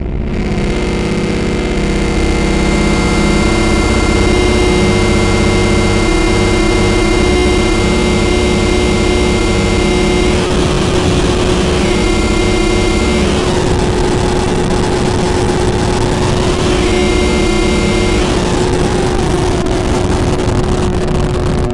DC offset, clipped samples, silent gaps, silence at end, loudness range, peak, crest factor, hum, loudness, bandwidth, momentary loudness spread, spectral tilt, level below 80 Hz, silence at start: under 0.1%; under 0.1%; none; 0 s; 2 LU; 0 dBFS; 12 dB; none; -12 LUFS; 11.5 kHz; 3 LU; -5.5 dB/octave; -18 dBFS; 0 s